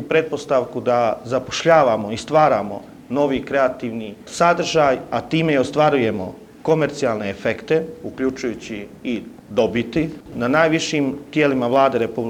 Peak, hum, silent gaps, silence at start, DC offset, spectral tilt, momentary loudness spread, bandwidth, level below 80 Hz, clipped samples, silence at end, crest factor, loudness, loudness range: 0 dBFS; none; none; 0 s; under 0.1%; -5.5 dB/octave; 12 LU; 15.5 kHz; -52 dBFS; under 0.1%; 0 s; 20 dB; -19 LUFS; 4 LU